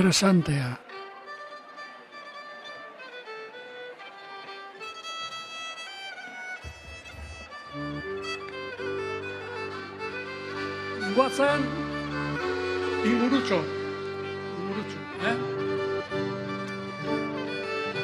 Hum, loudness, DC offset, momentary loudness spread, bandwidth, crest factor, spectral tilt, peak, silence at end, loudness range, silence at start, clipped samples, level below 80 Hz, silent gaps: none; -30 LUFS; under 0.1%; 17 LU; 14.5 kHz; 24 dB; -5 dB/octave; -8 dBFS; 0 s; 13 LU; 0 s; under 0.1%; -56 dBFS; none